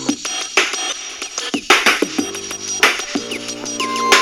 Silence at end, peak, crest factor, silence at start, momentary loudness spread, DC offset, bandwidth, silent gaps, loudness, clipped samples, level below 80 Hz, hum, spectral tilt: 0 s; 0 dBFS; 18 dB; 0 s; 12 LU; under 0.1%; over 20 kHz; none; -17 LUFS; under 0.1%; -54 dBFS; none; -0.5 dB/octave